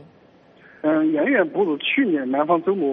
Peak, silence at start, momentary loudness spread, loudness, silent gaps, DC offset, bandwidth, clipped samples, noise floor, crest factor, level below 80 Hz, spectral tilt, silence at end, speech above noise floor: -6 dBFS; 0.85 s; 3 LU; -20 LUFS; none; under 0.1%; 3.9 kHz; under 0.1%; -52 dBFS; 14 dB; -72 dBFS; -3.5 dB/octave; 0 s; 32 dB